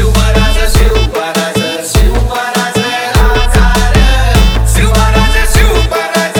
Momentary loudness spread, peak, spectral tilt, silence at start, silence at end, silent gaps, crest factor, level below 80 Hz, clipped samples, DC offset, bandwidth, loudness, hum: 4 LU; 0 dBFS; -4.5 dB/octave; 0 s; 0 s; none; 8 dB; -10 dBFS; under 0.1%; under 0.1%; 20 kHz; -10 LUFS; none